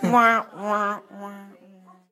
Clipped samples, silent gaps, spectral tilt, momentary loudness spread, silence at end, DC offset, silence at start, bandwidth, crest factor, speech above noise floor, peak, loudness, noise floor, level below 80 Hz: under 0.1%; none; -5.5 dB/octave; 22 LU; 0.65 s; under 0.1%; 0 s; 16 kHz; 20 dB; 29 dB; -4 dBFS; -22 LUFS; -51 dBFS; -84 dBFS